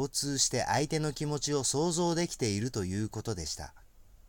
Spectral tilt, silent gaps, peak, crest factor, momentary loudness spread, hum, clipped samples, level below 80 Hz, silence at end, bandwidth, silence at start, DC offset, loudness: -4 dB/octave; none; -16 dBFS; 16 dB; 9 LU; none; under 0.1%; -54 dBFS; 0.1 s; 17 kHz; 0 s; under 0.1%; -31 LUFS